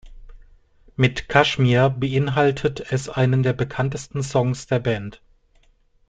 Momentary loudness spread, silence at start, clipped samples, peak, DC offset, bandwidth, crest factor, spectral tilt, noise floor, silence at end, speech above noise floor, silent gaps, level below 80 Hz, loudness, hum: 9 LU; 0.05 s; under 0.1%; -2 dBFS; under 0.1%; 9 kHz; 20 dB; -6 dB/octave; -58 dBFS; 0.95 s; 38 dB; none; -46 dBFS; -21 LUFS; none